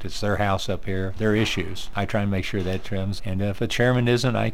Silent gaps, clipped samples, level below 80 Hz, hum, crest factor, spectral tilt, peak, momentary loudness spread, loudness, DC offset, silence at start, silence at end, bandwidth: none; under 0.1%; -38 dBFS; none; 16 dB; -6 dB/octave; -8 dBFS; 8 LU; -24 LUFS; 3%; 0 s; 0 s; 15.5 kHz